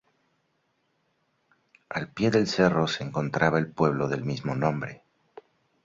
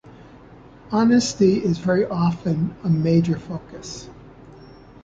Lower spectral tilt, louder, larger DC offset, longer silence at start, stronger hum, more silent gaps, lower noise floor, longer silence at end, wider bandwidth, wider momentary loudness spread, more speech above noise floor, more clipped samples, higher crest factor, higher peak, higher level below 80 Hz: about the same, -6 dB/octave vs -6.5 dB/octave; second, -26 LUFS vs -20 LUFS; neither; first, 1.9 s vs 0.05 s; neither; neither; first, -73 dBFS vs -45 dBFS; first, 0.9 s vs 0.4 s; about the same, 7.8 kHz vs 7.8 kHz; second, 11 LU vs 17 LU; first, 47 dB vs 25 dB; neither; first, 22 dB vs 16 dB; about the same, -6 dBFS vs -6 dBFS; second, -60 dBFS vs -50 dBFS